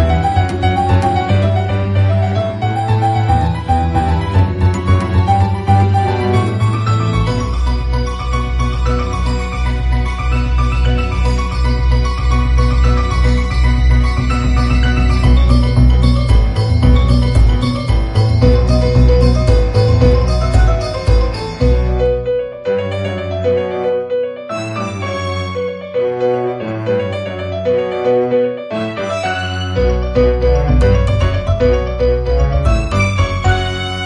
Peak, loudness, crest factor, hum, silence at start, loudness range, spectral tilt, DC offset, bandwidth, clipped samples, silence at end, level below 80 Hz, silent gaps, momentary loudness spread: 0 dBFS; -15 LUFS; 12 dB; none; 0 s; 6 LU; -7 dB/octave; under 0.1%; 10.5 kHz; under 0.1%; 0 s; -16 dBFS; none; 7 LU